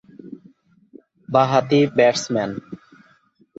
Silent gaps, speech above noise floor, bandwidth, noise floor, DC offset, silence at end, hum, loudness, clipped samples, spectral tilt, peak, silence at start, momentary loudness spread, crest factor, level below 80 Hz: none; 40 dB; 8 kHz; -58 dBFS; under 0.1%; 0.8 s; none; -18 LUFS; under 0.1%; -5.5 dB/octave; -2 dBFS; 0.25 s; 24 LU; 20 dB; -62 dBFS